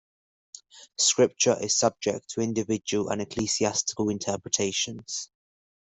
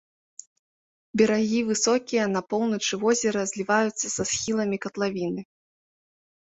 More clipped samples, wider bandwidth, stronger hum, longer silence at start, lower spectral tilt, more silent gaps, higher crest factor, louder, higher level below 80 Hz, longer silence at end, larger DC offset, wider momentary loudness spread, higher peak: neither; about the same, 8.4 kHz vs 8.4 kHz; neither; second, 0.75 s vs 1.15 s; about the same, -3 dB/octave vs -3.5 dB/octave; neither; about the same, 20 dB vs 18 dB; about the same, -26 LUFS vs -25 LUFS; about the same, -64 dBFS vs -64 dBFS; second, 0.6 s vs 1.05 s; neither; first, 12 LU vs 6 LU; about the same, -8 dBFS vs -8 dBFS